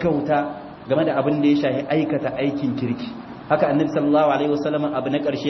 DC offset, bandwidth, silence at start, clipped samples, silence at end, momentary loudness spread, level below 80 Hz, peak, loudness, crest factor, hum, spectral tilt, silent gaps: under 0.1%; 6.2 kHz; 0 s; under 0.1%; 0 s; 8 LU; -56 dBFS; -4 dBFS; -21 LUFS; 16 dB; none; -8 dB/octave; none